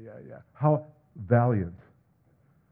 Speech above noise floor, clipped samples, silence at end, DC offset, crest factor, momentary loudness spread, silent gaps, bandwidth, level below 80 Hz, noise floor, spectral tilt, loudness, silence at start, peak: 38 dB; under 0.1%; 0.95 s; under 0.1%; 22 dB; 24 LU; none; 2.8 kHz; -60 dBFS; -65 dBFS; -13 dB/octave; -27 LUFS; 0 s; -8 dBFS